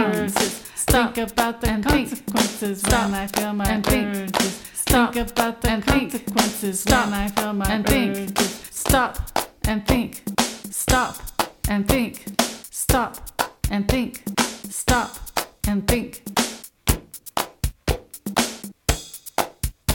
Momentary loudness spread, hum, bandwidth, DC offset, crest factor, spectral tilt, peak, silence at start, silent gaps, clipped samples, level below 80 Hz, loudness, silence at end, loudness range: 8 LU; none; 18 kHz; under 0.1%; 22 dB; -4 dB/octave; 0 dBFS; 0 s; none; under 0.1%; -32 dBFS; -22 LUFS; 0 s; 4 LU